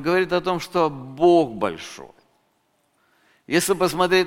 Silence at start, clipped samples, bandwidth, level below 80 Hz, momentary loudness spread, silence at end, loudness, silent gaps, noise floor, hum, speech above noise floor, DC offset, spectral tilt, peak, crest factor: 0 s; under 0.1%; 16.5 kHz; -54 dBFS; 13 LU; 0 s; -21 LUFS; none; -67 dBFS; none; 47 dB; under 0.1%; -4.5 dB/octave; -4 dBFS; 18 dB